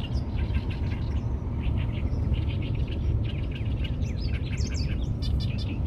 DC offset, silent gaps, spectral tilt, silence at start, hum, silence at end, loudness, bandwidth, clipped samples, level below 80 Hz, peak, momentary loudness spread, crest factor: under 0.1%; none; -7 dB/octave; 0 s; none; 0 s; -30 LUFS; 8 kHz; under 0.1%; -30 dBFS; -14 dBFS; 2 LU; 14 dB